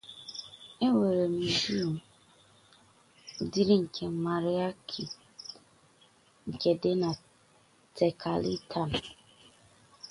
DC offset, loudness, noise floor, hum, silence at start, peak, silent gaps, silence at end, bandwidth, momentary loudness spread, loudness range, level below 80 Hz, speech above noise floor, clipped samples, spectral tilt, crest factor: under 0.1%; -30 LUFS; -64 dBFS; none; 0.05 s; -12 dBFS; none; 0 s; 11.5 kHz; 19 LU; 3 LU; -62 dBFS; 34 dB; under 0.1%; -6 dB/octave; 20 dB